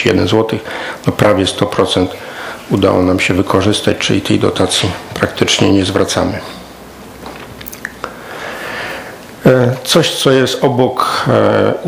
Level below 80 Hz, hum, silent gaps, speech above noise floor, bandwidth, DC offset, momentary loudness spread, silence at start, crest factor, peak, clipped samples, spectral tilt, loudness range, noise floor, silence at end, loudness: -44 dBFS; none; none; 21 dB; 18.5 kHz; under 0.1%; 17 LU; 0 s; 14 dB; 0 dBFS; 0.2%; -5 dB/octave; 6 LU; -33 dBFS; 0 s; -13 LUFS